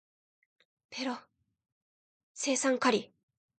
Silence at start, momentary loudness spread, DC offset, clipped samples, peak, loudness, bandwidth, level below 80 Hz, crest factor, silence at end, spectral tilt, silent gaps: 0.9 s; 14 LU; under 0.1%; under 0.1%; -14 dBFS; -31 LUFS; 9.4 kHz; -84 dBFS; 22 dB; 0.55 s; -2.5 dB/octave; 1.72-2.35 s